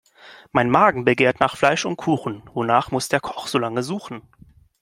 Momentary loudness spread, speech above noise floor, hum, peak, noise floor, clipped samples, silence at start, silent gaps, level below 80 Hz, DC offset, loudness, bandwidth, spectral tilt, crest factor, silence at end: 13 LU; 27 dB; none; 0 dBFS; -47 dBFS; under 0.1%; 0.25 s; none; -56 dBFS; under 0.1%; -20 LUFS; 16 kHz; -5 dB/octave; 20 dB; 0.6 s